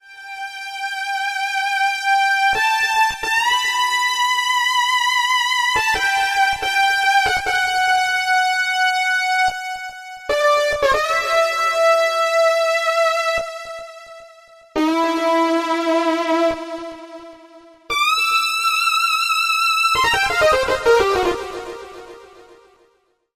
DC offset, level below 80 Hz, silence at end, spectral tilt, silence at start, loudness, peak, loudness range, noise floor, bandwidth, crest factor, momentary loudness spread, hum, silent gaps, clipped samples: under 0.1%; -48 dBFS; 0.95 s; -1.5 dB/octave; 0.1 s; -17 LUFS; -4 dBFS; 4 LU; -62 dBFS; 16 kHz; 14 dB; 13 LU; none; none; under 0.1%